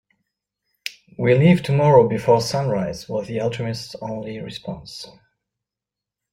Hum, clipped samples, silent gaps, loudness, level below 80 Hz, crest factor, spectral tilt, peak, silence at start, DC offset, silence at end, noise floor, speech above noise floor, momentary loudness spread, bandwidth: 50 Hz at -55 dBFS; under 0.1%; none; -19 LUFS; -54 dBFS; 20 dB; -7 dB/octave; -2 dBFS; 0.85 s; under 0.1%; 1.2 s; -87 dBFS; 68 dB; 19 LU; 16 kHz